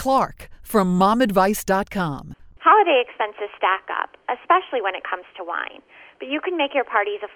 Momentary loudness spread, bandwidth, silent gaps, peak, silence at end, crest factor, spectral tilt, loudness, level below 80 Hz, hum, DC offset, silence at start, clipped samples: 13 LU; 18 kHz; none; -2 dBFS; 0.1 s; 20 dB; -5 dB/octave; -21 LUFS; -50 dBFS; none; under 0.1%; 0 s; under 0.1%